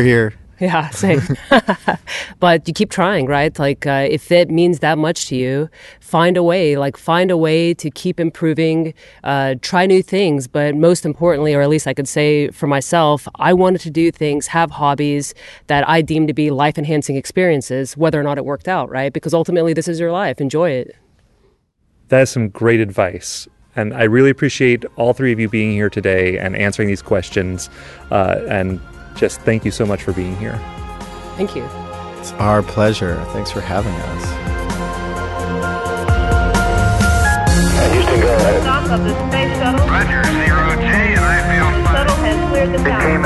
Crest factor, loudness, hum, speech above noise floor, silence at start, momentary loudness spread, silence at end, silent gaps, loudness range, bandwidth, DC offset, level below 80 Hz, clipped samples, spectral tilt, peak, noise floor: 14 dB; -16 LUFS; none; 44 dB; 0 s; 9 LU; 0 s; none; 5 LU; 12.5 kHz; under 0.1%; -26 dBFS; under 0.1%; -5.5 dB/octave; -2 dBFS; -59 dBFS